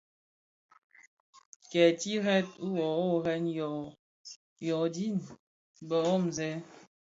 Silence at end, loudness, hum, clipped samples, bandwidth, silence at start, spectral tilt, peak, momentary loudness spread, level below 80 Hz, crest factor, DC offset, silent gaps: 0.4 s; -31 LUFS; none; under 0.1%; 8 kHz; 1.7 s; -5.5 dB/octave; -12 dBFS; 23 LU; -74 dBFS; 22 dB; under 0.1%; 3.99-4.24 s, 4.36-4.56 s, 5.39-5.74 s